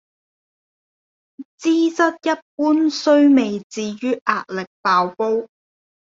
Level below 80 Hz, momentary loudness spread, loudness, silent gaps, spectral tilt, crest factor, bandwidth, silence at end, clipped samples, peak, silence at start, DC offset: -68 dBFS; 10 LU; -18 LUFS; 1.45-1.58 s, 2.42-2.58 s, 3.64-3.70 s, 4.21-4.25 s, 4.67-4.84 s; -4.5 dB/octave; 18 dB; 7.8 kHz; 0.75 s; under 0.1%; -2 dBFS; 1.4 s; under 0.1%